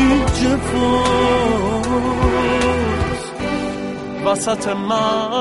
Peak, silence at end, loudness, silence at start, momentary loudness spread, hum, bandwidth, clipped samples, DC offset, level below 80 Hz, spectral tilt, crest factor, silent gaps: -2 dBFS; 0 s; -18 LUFS; 0 s; 8 LU; none; 11.5 kHz; under 0.1%; under 0.1%; -30 dBFS; -5 dB/octave; 14 dB; none